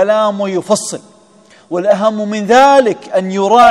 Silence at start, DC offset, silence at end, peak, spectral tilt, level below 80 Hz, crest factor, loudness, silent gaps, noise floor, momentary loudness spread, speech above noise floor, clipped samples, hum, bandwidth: 0 s; under 0.1%; 0 s; 0 dBFS; -4.5 dB/octave; -58 dBFS; 12 dB; -12 LUFS; none; -45 dBFS; 11 LU; 34 dB; 1%; none; 13 kHz